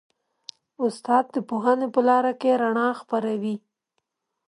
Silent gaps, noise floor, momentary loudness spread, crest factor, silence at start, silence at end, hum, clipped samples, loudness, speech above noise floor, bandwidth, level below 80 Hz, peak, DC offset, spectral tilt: none; -78 dBFS; 20 LU; 18 dB; 0.8 s; 0.9 s; none; under 0.1%; -23 LUFS; 56 dB; 11 kHz; -78 dBFS; -6 dBFS; under 0.1%; -6 dB/octave